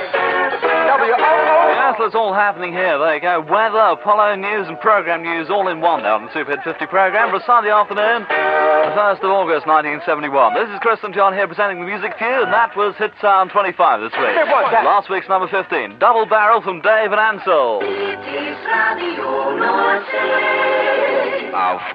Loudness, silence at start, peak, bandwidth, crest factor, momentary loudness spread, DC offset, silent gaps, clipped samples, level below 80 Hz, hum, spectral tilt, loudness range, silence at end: -16 LUFS; 0 s; 0 dBFS; 5.4 kHz; 16 dB; 6 LU; under 0.1%; none; under 0.1%; -68 dBFS; none; -6.5 dB/octave; 2 LU; 0 s